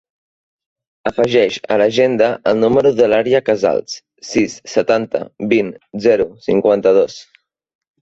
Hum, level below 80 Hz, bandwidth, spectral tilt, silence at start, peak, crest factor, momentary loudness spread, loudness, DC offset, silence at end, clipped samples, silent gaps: none; -52 dBFS; 8 kHz; -5.5 dB/octave; 1.05 s; -2 dBFS; 14 dB; 10 LU; -15 LUFS; under 0.1%; 0.8 s; under 0.1%; none